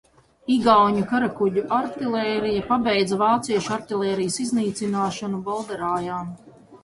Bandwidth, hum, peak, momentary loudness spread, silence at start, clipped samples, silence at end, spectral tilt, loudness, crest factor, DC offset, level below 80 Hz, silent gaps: 11.5 kHz; none; -4 dBFS; 11 LU; 0.5 s; under 0.1%; 0.05 s; -5 dB/octave; -22 LUFS; 18 dB; under 0.1%; -56 dBFS; none